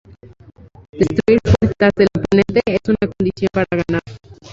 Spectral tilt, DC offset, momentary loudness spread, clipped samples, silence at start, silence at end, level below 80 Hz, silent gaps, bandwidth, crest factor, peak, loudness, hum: -7.5 dB/octave; under 0.1%; 6 LU; under 0.1%; 0.25 s; 0.05 s; -34 dBFS; 0.89-0.93 s; 7.8 kHz; 16 dB; 0 dBFS; -16 LUFS; none